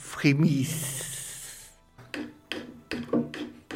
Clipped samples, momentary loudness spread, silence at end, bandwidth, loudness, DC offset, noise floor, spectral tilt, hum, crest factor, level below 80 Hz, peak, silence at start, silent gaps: under 0.1%; 16 LU; 0 s; 16.5 kHz; -30 LUFS; under 0.1%; -53 dBFS; -5 dB/octave; none; 20 dB; -60 dBFS; -10 dBFS; 0 s; none